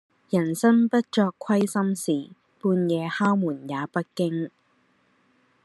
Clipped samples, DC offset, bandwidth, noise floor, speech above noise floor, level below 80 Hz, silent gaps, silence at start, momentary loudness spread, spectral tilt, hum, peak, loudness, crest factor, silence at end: under 0.1%; under 0.1%; 12.5 kHz; -65 dBFS; 42 dB; -74 dBFS; none; 0.3 s; 9 LU; -6 dB/octave; none; -8 dBFS; -24 LUFS; 16 dB; 1.15 s